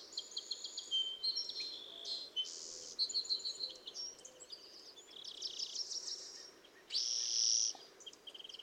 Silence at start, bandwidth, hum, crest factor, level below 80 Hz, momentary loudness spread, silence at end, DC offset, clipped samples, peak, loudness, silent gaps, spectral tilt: 0 s; 17 kHz; none; 20 dB; -86 dBFS; 18 LU; 0 s; under 0.1%; under 0.1%; -22 dBFS; -38 LUFS; none; 2.5 dB/octave